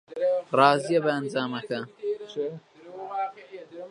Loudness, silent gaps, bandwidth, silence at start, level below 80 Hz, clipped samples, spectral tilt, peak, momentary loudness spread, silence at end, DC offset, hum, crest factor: -26 LUFS; none; 11 kHz; 0.1 s; -78 dBFS; under 0.1%; -5.5 dB/octave; -4 dBFS; 22 LU; 0 s; under 0.1%; none; 24 dB